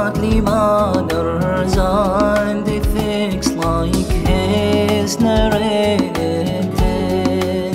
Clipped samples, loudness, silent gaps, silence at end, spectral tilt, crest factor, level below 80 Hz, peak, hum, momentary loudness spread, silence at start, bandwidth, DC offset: under 0.1%; -17 LUFS; none; 0 s; -6 dB/octave; 14 dB; -26 dBFS; -2 dBFS; none; 4 LU; 0 s; 16 kHz; under 0.1%